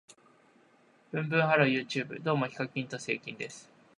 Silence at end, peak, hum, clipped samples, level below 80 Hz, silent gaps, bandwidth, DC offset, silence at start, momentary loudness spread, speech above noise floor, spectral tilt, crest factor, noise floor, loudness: 0.35 s; -8 dBFS; none; under 0.1%; -78 dBFS; none; 11 kHz; under 0.1%; 1.15 s; 15 LU; 33 dB; -5.5 dB/octave; 24 dB; -64 dBFS; -31 LUFS